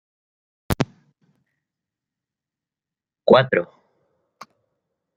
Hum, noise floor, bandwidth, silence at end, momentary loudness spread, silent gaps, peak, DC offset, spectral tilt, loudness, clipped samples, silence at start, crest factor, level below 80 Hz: none; -89 dBFS; 12 kHz; 1.55 s; 13 LU; none; -2 dBFS; under 0.1%; -6 dB/octave; -20 LUFS; under 0.1%; 0.7 s; 24 dB; -48 dBFS